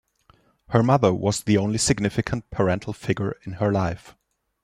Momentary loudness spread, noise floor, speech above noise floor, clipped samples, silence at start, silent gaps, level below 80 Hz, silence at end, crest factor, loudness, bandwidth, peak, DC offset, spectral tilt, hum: 9 LU; -60 dBFS; 37 dB; under 0.1%; 0.7 s; none; -50 dBFS; 0.55 s; 20 dB; -23 LUFS; 14 kHz; -4 dBFS; under 0.1%; -5.5 dB/octave; none